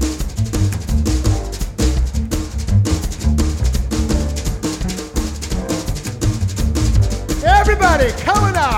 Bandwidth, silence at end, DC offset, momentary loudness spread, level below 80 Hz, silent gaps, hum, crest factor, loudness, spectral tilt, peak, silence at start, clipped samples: 16.5 kHz; 0 s; under 0.1%; 9 LU; -20 dBFS; none; none; 16 dB; -18 LUFS; -5.5 dB/octave; 0 dBFS; 0 s; under 0.1%